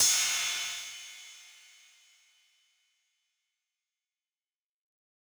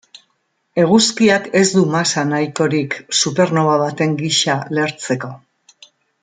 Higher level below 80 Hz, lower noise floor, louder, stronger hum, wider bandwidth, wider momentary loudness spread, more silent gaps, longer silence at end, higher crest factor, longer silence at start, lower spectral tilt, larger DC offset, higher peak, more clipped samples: second, -84 dBFS vs -60 dBFS; first, under -90 dBFS vs -67 dBFS; second, -29 LUFS vs -16 LUFS; neither; first, over 20 kHz vs 9.6 kHz; first, 25 LU vs 8 LU; neither; first, 3.8 s vs 0.85 s; first, 24 dB vs 16 dB; second, 0 s vs 0.75 s; second, 3.5 dB/octave vs -4 dB/octave; neither; second, -12 dBFS vs -2 dBFS; neither